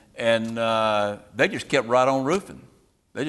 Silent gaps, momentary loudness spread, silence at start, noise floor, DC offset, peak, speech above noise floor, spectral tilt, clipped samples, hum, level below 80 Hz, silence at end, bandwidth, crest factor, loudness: none; 7 LU; 0.15 s; -43 dBFS; under 0.1%; -6 dBFS; 20 dB; -4.5 dB/octave; under 0.1%; none; -60 dBFS; 0 s; 12.5 kHz; 18 dB; -23 LUFS